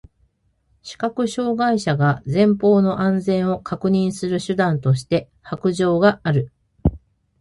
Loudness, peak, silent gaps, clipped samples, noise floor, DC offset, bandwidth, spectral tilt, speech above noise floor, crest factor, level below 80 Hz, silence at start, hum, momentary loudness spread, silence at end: -20 LUFS; -4 dBFS; none; under 0.1%; -64 dBFS; under 0.1%; 11.5 kHz; -7 dB/octave; 45 dB; 16 dB; -40 dBFS; 0.85 s; none; 8 LU; 0.45 s